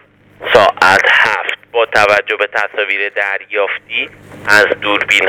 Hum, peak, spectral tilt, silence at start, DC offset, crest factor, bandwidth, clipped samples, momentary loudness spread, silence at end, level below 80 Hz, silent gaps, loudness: none; 0 dBFS; -2.5 dB/octave; 0.4 s; under 0.1%; 14 dB; 19.5 kHz; 0.3%; 10 LU; 0 s; -52 dBFS; none; -12 LUFS